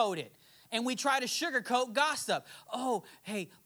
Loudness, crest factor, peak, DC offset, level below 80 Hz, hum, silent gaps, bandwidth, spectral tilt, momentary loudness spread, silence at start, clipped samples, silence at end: -33 LUFS; 18 dB; -16 dBFS; under 0.1%; -86 dBFS; none; none; over 20 kHz; -2.5 dB/octave; 10 LU; 0 s; under 0.1%; 0.2 s